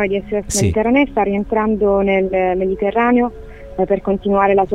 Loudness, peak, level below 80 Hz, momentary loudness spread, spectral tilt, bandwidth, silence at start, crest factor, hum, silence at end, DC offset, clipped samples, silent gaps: -16 LUFS; -2 dBFS; -36 dBFS; 6 LU; -5.5 dB/octave; 15 kHz; 0 s; 14 dB; none; 0 s; under 0.1%; under 0.1%; none